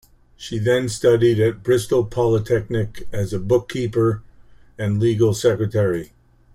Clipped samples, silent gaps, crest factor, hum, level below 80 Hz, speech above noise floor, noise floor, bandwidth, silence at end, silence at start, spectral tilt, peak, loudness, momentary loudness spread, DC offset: under 0.1%; none; 16 dB; none; -46 dBFS; 28 dB; -46 dBFS; 15 kHz; 0.5 s; 0.4 s; -6.5 dB/octave; -4 dBFS; -20 LUFS; 11 LU; under 0.1%